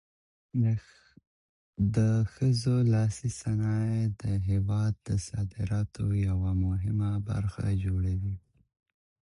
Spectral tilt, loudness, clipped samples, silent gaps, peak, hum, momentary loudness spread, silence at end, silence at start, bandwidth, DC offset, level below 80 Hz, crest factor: -7.5 dB/octave; -29 LUFS; under 0.1%; 1.27-1.73 s; -14 dBFS; none; 8 LU; 1 s; 0.55 s; 11 kHz; under 0.1%; -42 dBFS; 14 dB